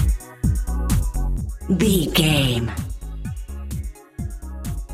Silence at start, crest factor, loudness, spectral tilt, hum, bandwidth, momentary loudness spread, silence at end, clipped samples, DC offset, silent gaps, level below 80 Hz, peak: 0 s; 18 dB; -23 LUFS; -5 dB/octave; none; 16 kHz; 15 LU; 0 s; under 0.1%; under 0.1%; none; -26 dBFS; -4 dBFS